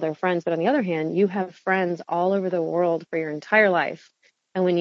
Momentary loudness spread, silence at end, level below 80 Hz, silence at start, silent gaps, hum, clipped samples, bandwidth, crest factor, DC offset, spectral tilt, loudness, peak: 9 LU; 0 s; -76 dBFS; 0 s; none; none; under 0.1%; 7.2 kHz; 18 dB; under 0.1%; -7.5 dB/octave; -23 LUFS; -4 dBFS